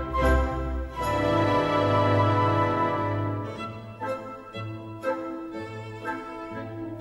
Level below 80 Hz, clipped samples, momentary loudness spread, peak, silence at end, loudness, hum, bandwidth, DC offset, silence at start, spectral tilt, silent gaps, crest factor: -36 dBFS; under 0.1%; 14 LU; -10 dBFS; 0 s; -27 LUFS; none; 12.5 kHz; under 0.1%; 0 s; -7 dB/octave; none; 16 dB